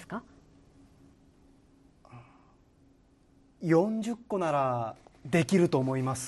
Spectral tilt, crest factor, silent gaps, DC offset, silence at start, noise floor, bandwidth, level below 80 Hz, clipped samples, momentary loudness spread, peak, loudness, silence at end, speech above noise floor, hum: -6.5 dB/octave; 20 dB; none; under 0.1%; 0 s; -62 dBFS; 12 kHz; -66 dBFS; under 0.1%; 15 LU; -12 dBFS; -29 LUFS; 0 s; 35 dB; none